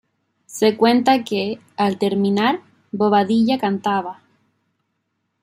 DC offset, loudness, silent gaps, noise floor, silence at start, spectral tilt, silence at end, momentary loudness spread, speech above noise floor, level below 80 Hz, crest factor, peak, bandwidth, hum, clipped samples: under 0.1%; -19 LUFS; none; -73 dBFS; 0.5 s; -5.5 dB/octave; 1.3 s; 11 LU; 55 dB; -66 dBFS; 18 dB; -2 dBFS; 15.5 kHz; none; under 0.1%